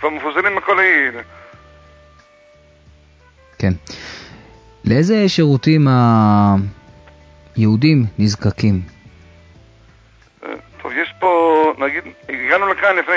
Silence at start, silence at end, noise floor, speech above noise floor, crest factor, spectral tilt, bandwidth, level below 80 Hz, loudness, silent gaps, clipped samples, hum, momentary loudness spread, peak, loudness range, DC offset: 0 s; 0 s; -49 dBFS; 35 dB; 16 dB; -7 dB/octave; 7.8 kHz; -42 dBFS; -15 LUFS; none; under 0.1%; none; 19 LU; -2 dBFS; 10 LU; under 0.1%